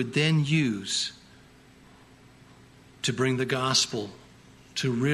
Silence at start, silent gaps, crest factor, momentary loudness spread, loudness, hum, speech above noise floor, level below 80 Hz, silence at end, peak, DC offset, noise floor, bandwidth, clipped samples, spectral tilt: 0 s; none; 18 dB; 11 LU; -26 LUFS; none; 28 dB; -62 dBFS; 0 s; -10 dBFS; under 0.1%; -54 dBFS; 13 kHz; under 0.1%; -4 dB/octave